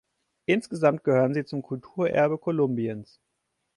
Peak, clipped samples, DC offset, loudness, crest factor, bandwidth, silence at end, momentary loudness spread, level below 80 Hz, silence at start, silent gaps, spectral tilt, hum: -8 dBFS; under 0.1%; under 0.1%; -26 LUFS; 18 dB; 11.5 kHz; 0.75 s; 11 LU; -68 dBFS; 0.5 s; none; -7.5 dB/octave; none